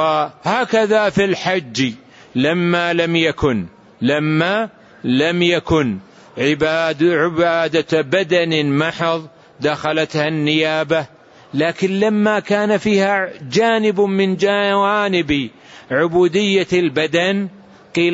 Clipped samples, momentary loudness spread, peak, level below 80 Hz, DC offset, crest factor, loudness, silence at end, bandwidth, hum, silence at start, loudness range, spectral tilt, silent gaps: under 0.1%; 7 LU; -4 dBFS; -48 dBFS; under 0.1%; 12 dB; -17 LUFS; 0 s; 8 kHz; none; 0 s; 2 LU; -5.5 dB/octave; none